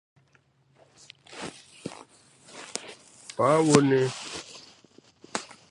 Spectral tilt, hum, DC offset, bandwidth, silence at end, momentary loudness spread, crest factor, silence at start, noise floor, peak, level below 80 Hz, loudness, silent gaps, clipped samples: -5 dB/octave; none; under 0.1%; 11.5 kHz; 0.25 s; 26 LU; 30 dB; 1.3 s; -64 dBFS; 0 dBFS; -70 dBFS; -25 LUFS; none; under 0.1%